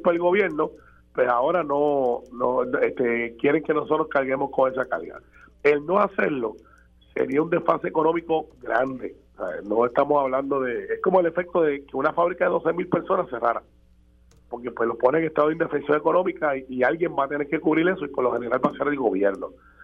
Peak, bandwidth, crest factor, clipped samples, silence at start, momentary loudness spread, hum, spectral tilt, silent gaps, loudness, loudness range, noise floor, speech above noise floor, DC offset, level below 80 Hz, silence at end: -4 dBFS; 5.8 kHz; 20 dB; under 0.1%; 0 s; 8 LU; none; -8.5 dB/octave; none; -23 LUFS; 2 LU; -56 dBFS; 33 dB; under 0.1%; -58 dBFS; 0 s